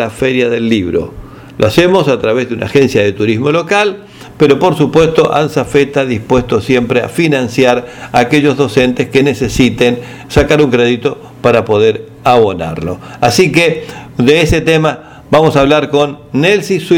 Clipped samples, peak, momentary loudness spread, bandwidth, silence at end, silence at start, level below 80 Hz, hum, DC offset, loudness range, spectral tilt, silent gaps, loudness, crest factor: 0.3%; 0 dBFS; 7 LU; 17 kHz; 0 s; 0 s; -34 dBFS; none; under 0.1%; 1 LU; -5.5 dB/octave; none; -11 LUFS; 10 dB